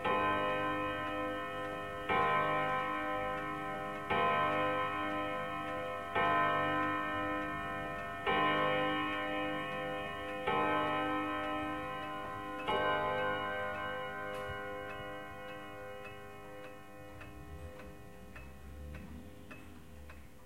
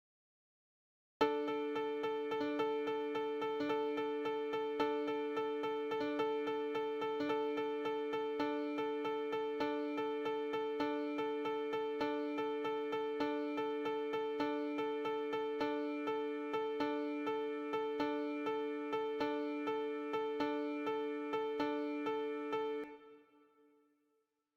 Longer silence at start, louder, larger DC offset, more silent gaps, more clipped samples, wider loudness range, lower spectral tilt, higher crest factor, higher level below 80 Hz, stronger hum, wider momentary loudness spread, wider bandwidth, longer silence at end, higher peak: second, 0 s vs 1.2 s; first, -35 LUFS vs -39 LUFS; first, 0.2% vs under 0.1%; neither; neither; first, 16 LU vs 1 LU; about the same, -5.5 dB/octave vs -5.5 dB/octave; about the same, 18 dB vs 20 dB; first, -60 dBFS vs -80 dBFS; neither; first, 20 LU vs 2 LU; about the same, 16.5 kHz vs 15 kHz; second, 0 s vs 1.35 s; about the same, -18 dBFS vs -18 dBFS